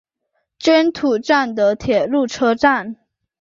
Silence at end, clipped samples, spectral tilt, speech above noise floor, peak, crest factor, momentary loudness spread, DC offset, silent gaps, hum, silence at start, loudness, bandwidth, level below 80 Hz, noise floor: 0.45 s; under 0.1%; -4.5 dB/octave; 55 dB; -2 dBFS; 16 dB; 6 LU; under 0.1%; none; none; 0.6 s; -17 LUFS; 7.6 kHz; -52 dBFS; -71 dBFS